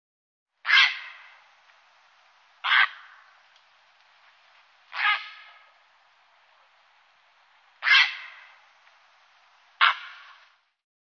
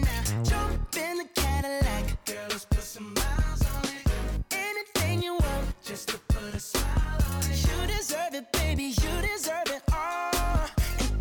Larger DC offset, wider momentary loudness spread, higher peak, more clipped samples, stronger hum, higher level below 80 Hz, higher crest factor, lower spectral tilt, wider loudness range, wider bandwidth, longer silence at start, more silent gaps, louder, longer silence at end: neither; first, 24 LU vs 4 LU; first, -4 dBFS vs -16 dBFS; neither; first, 50 Hz at -100 dBFS vs none; second, under -90 dBFS vs -30 dBFS; first, 26 dB vs 12 dB; second, 5.5 dB/octave vs -4.5 dB/octave; first, 8 LU vs 1 LU; second, 6.6 kHz vs 19.5 kHz; first, 0.65 s vs 0 s; neither; first, -22 LUFS vs -29 LUFS; first, 1.1 s vs 0 s